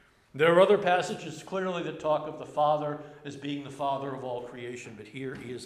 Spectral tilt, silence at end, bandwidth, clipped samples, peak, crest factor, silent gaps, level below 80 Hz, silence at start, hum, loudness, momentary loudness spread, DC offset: -5.5 dB/octave; 0 s; 12.5 kHz; under 0.1%; -8 dBFS; 20 dB; none; -70 dBFS; 0.35 s; none; -28 LUFS; 18 LU; under 0.1%